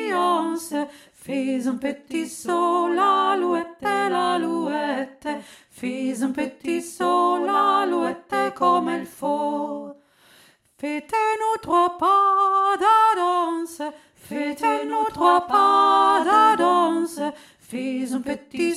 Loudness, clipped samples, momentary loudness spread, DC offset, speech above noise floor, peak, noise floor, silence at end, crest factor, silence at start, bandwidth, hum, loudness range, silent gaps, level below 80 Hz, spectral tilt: -21 LUFS; under 0.1%; 14 LU; under 0.1%; 34 dB; -4 dBFS; -55 dBFS; 0 s; 16 dB; 0 s; 15 kHz; none; 6 LU; none; -66 dBFS; -4 dB/octave